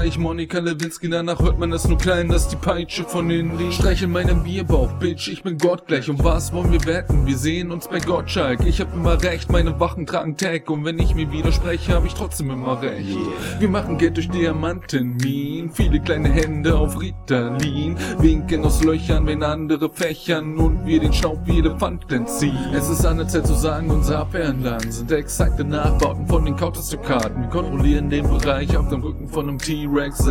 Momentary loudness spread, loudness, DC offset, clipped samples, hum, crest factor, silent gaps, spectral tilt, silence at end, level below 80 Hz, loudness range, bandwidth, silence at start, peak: 6 LU; -21 LUFS; under 0.1%; under 0.1%; none; 16 dB; none; -6 dB/octave; 0 s; -24 dBFS; 2 LU; 18 kHz; 0 s; -2 dBFS